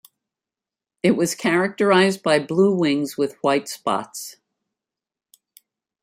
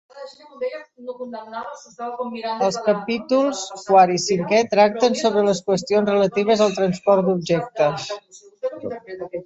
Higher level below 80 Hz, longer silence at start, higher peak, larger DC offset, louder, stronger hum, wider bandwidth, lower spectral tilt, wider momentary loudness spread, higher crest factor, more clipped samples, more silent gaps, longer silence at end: about the same, -68 dBFS vs -64 dBFS; first, 1.05 s vs 0.15 s; about the same, -4 dBFS vs -2 dBFS; neither; about the same, -20 LUFS vs -20 LUFS; neither; first, 16 kHz vs 8.2 kHz; about the same, -5 dB/octave vs -5 dB/octave; second, 9 LU vs 16 LU; about the same, 18 dB vs 18 dB; neither; neither; first, 1.7 s vs 0 s